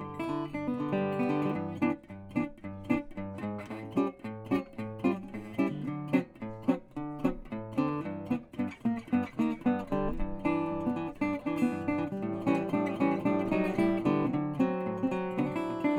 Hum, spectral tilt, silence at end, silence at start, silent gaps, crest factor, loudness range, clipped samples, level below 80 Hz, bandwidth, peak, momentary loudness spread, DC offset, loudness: none; -8.5 dB/octave; 0 s; 0 s; none; 18 dB; 5 LU; under 0.1%; -52 dBFS; 13.5 kHz; -14 dBFS; 8 LU; under 0.1%; -32 LUFS